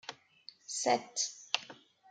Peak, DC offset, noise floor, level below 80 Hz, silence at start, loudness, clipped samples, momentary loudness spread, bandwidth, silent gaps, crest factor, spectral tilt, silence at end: -10 dBFS; under 0.1%; -59 dBFS; under -90 dBFS; 0.1 s; -34 LUFS; under 0.1%; 22 LU; 10.5 kHz; none; 28 dB; -0.5 dB/octave; 0.35 s